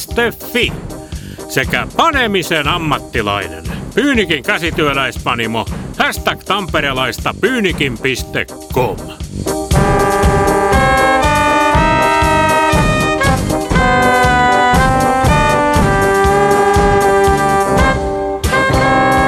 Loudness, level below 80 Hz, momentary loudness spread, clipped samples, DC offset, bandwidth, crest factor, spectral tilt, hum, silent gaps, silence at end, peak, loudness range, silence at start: -13 LUFS; -24 dBFS; 9 LU; under 0.1%; under 0.1%; 19 kHz; 12 dB; -4.5 dB/octave; none; none; 0 s; 0 dBFS; 5 LU; 0 s